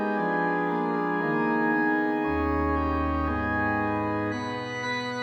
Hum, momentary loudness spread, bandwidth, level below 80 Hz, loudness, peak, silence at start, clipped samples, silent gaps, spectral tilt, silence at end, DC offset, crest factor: none; 5 LU; over 20 kHz; -40 dBFS; -26 LUFS; -12 dBFS; 0 s; under 0.1%; none; -7 dB/octave; 0 s; under 0.1%; 14 dB